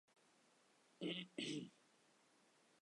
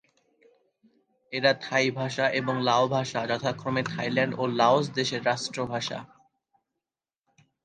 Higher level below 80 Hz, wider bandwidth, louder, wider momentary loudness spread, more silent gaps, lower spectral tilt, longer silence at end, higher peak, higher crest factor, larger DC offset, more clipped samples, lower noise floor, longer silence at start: second, under -90 dBFS vs -68 dBFS; first, 11 kHz vs 9.8 kHz; second, -49 LUFS vs -26 LUFS; second, 5 LU vs 8 LU; neither; about the same, -4 dB/octave vs -4.5 dB/octave; second, 1.15 s vs 1.6 s; second, -34 dBFS vs -8 dBFS; about the same, 20 dB vs 20 dB; neither; neither; second, -75 dBFS vs -90 dBFS; second, 1 s vs 1.3 s